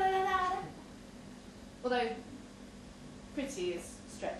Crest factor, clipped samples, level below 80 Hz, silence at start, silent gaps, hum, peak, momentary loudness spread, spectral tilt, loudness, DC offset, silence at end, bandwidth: 18 dB; under 0.1%; -60 dBFS; 0 s; none; none; -20 dBFS; 19 LU; -4 dB/octave; -36 LUFS; under 0.1%; 0 s; 13 kHz